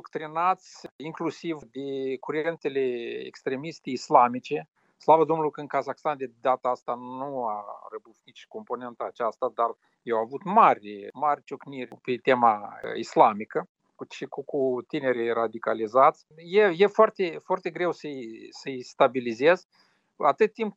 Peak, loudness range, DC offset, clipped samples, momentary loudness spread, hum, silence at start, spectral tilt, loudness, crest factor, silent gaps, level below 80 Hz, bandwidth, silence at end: -2 dBFS; 8 LU; under 0.1%; under 0.1%; 17 LU; none; 0.05 s; -6 dB/octave; -26 LUFS; 24 dB; 0.91-0.99 s, 13.69-13.75 s, 19.65-19.69 s; -82 dBFS; 8 kHz; 0.05 s